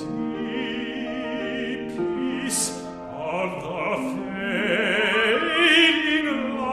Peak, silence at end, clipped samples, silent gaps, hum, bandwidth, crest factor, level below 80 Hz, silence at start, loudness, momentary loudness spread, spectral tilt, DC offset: -6 dBFS; 0 s; under 0.1%; none; none; 15 kHz; 18 dB; -56 dBFS; 0 s; -23 LUFS; 13 LU; -2.5 dB/octave; under 0.1%